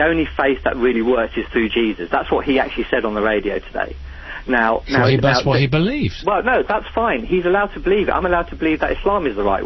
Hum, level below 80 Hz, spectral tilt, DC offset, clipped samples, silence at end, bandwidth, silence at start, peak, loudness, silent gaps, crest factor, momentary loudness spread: none; -34 dBFS; -7 dB/octave; under 0.1%; under 0.1%; 0 s; 6.2 kHz; 0 s; -2 dBFS; -18 LUFS; none; 16 dB; 5 LU